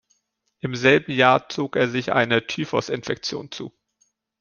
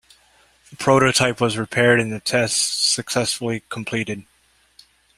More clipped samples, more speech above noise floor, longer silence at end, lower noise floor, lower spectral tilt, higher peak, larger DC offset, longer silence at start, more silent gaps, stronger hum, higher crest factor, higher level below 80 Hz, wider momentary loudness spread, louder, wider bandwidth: neither; first, 51 dB vs 40 dB; second, 0.7 s vs 0.95 s; first, -72 dBFS vs -60 dBFS; first, -5 dB/octave vs -3 dB/octave; about the same, -2 dBFS vs -2 dBFS; neither; about the same, 0.65 s vs 0.7 s; neither; neither; about the same, 22 dB vs 20 dB; second, -62 dBFS vs -56 dBFS; first, 15 LU vs 10 LU; about the same, -21 LUFS vs -19 LUFS; second, 7.2 kHz vs 16 kHz